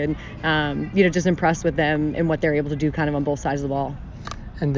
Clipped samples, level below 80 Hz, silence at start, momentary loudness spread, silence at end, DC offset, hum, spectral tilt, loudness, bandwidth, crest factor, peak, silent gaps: under 0.1%; -40 dBFS; 0 s; 10 LU; 0 s; under 0.1%; none; -6.5 dB/octave; -22 LUFS; 7.6 kHz; 16 dB; -6 dBFS; none